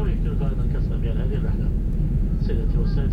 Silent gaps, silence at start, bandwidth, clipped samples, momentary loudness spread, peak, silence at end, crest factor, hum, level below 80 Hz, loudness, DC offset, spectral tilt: none; 0 s; 5 kHz; under 0.1%; 1 LU; -10 dBFS; 0 s; 10 dB; none; -22 dBFS; -25 LUFS; under 0.1%; -10 dB/octave